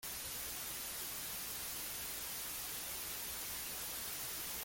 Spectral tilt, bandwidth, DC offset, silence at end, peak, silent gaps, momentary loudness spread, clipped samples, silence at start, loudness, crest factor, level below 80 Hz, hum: 0 dB/octave; 17 kHz; under 0.1%; 0 s; -30 dBFS; none; 1 LU; under 0.1%; 0 s; -41 LUFS; 14 dB; -64 dBFS; none